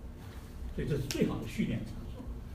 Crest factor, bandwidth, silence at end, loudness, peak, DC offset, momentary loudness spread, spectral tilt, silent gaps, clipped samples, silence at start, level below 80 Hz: 22 dB; 15.5 kHz; 0 s; -36 LUFS; -14 dBFS; under 0.1%; 14 LU; -6 dB/octave; none; under 0.1%; 0 s; -44 dBFS